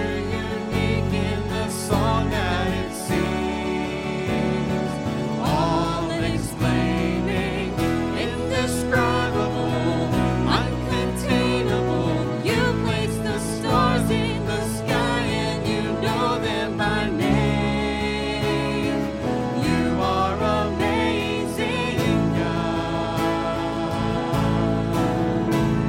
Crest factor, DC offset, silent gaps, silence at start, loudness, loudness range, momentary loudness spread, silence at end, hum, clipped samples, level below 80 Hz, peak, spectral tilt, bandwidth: 16 dB; under 0.1%; none; 0 s; -23 LUFS; 2 LU; 4 LU; 0 s; none; under 0.1%; -36 dBFS; -6 dBFS; -6 dB/octave; 17 kHz